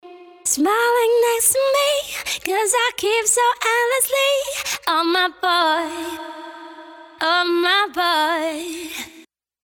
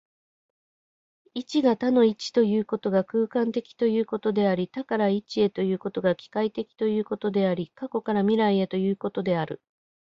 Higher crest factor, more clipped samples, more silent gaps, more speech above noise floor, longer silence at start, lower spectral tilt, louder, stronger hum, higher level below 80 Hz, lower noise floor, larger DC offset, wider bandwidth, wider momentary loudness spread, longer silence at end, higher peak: about the same, 16 dB vs 16 dB; neither; neither; second, 30 dB vs over 65 dB; second, 0.05 s vs 1.35 s; second, 0.5 dB/octave vs -7 dB/octave; first, -18 LUFS vs -25 LUFS; neither; first, -62 dBFS vs -68 dBFS; second, -49 dBFS vs under -90 dBFS; neither; first, over 20 kHz vs 7.6 kHz; first, 14 LU vs 7 LU; second, 0.45 s vs 0.65 s; first, -4 dBFS vs -10 dBFS